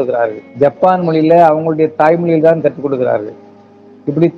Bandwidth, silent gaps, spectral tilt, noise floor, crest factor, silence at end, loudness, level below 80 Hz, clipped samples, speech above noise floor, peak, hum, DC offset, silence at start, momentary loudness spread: 6.4 kHz; none; -9.5 dB/octave; -40 dBFS; 12 dB; 0 s; -12 LUFS; -58 dBFS; 0.4%; 29 dB; 0 dBFS; none; under 0.1%; 0 s; 10 LU